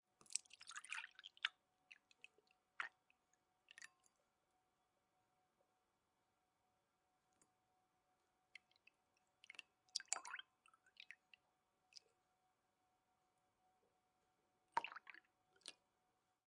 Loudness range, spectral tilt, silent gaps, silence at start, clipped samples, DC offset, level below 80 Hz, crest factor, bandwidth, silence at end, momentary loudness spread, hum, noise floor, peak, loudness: 14 LU; 2 dB/octave; none; 0.2 s; under 0.1%; under 0.1%; under -90 dBFS; 38 dB; 10.5 kHz; 0.75 s; 19 LU; none; -87 dBFS; -20 dBFS; -51 LUFS